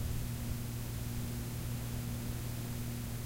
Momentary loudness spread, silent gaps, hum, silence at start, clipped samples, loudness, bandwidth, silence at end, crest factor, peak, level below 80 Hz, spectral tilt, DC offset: 1 LU; none; none; 0 s; under 0.1%; -40 LUFS; 16 kHz; 0 s; 12 dB; -26 dBFS; -44 dBFS; -5.5 dB/octave; under 0.1%